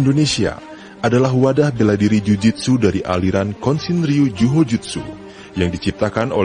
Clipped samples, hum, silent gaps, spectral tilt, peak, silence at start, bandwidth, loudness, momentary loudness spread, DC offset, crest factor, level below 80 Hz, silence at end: under 0.1%; none; none; -6.5 dB/octave; -2 dBFS; 0 s; 10 kHz; -17 LUFS; 12 LU; under 0.1%; 14 dB; -42 dBFS; 0 s